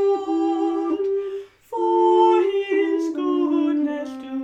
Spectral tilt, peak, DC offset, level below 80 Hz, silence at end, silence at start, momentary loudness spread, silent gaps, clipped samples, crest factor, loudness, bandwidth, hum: -4.5 dB/octave; -6 dBFS; under 0.1%; -68 dBFS; 0 s; 0 s; 14 LU; none; under 0.1%; 14 dB; -21 LUFS; 8 kHz; none